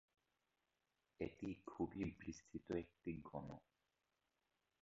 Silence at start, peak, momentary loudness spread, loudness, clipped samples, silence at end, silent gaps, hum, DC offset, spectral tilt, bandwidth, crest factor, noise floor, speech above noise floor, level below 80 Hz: 1.2 s; -30 dBFS; 9 LU; -50 LUFS; under 0.1%; 1.25 s; none; none; under 0.1%; -7 dB/octave; 7.6 kHz; 22 dB; -89 dBFS; 40 dB; -70 dBFS